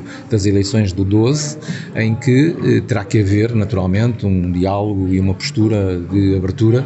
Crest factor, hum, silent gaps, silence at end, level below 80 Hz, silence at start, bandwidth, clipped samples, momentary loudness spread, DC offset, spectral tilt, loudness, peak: 12 dB; none; none; 0 s; -42 dBFS; 0 s; 8.4 kHz; under 0.1%; 4 LU; under 0.1%; -7 dB/octave; -16 LUFS; -2 dBFS